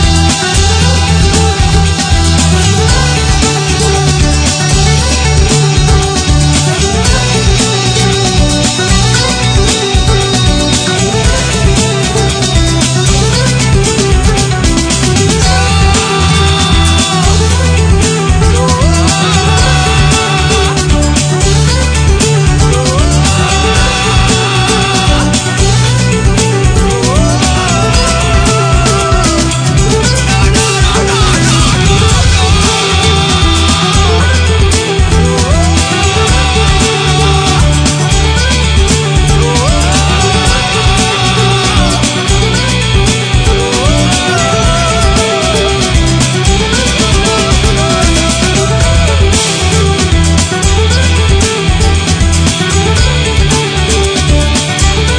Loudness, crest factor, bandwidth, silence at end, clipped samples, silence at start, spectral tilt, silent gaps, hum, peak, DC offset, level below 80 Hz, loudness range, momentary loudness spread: -9 LUFS; 8 dB; 10 kHz; 0 s; 0.3%; 0 s; -4 dB/octave; none; none; 0 dBFS; under 0.1%; -14 dBFS; 1 LU; 2 LU